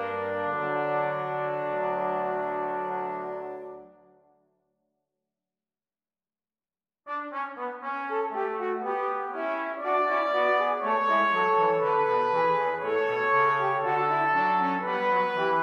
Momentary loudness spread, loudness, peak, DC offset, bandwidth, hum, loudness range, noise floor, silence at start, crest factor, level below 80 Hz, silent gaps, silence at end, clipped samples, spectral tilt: 10 LU; -27 LUFS; -12 dBFS; under 0.1%; 7.8 kHz; none; 15 LU; under -90 dBFS; 0 s; 14 dB; -76 dBFS; none; 0 s; under 0.1%; -6.5 dB/octave